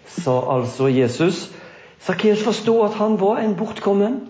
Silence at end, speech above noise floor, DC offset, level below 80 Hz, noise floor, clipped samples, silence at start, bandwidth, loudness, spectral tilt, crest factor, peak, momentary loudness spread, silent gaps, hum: 0 s; 23 dB; under 0.1%; -62 dBFS; -42 dBFS; under 0.1%; 0.05 s; 8 kHz; -19 LUFS; -6.5 dB/octave; 12 dB; -6 dBFS; 6 LU; none; none